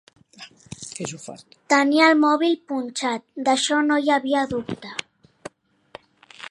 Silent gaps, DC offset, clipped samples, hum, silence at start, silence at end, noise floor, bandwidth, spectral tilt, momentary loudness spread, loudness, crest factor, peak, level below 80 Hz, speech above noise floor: none; under 0.1%; under 0.1%; none; 0.4 s; 0 s; -47 dBFS; 11.5 kHz; -3 dB/octave; 24 LU; -21 LUFS; 20 dB; -2 dBFS; -64 dBFS; 26 dB